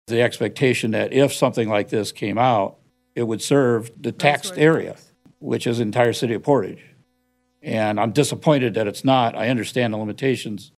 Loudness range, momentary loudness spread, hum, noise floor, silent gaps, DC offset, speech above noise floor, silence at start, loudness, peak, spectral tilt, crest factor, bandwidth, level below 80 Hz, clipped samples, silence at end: 2 LU; 9 LU; none; -67 dBFS; none; under 0.1%; 47 dB; 0.1 s; -20 LUFS; -2 dBFS; -5.5 dB/octave; 20 dB; 14.5 kHz; -68 dBFS; under 0.1%; 0.15 s